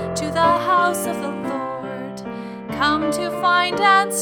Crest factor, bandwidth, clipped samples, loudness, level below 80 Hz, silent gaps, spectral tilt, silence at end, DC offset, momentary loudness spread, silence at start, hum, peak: 18 dB; 20 kHz; under 0.1%; -19 LUFS; -52 dBFS; none; -3.5 dB/octave; 0 s; under 0.1%; 15 LU; 0 s; none; -2 dBFS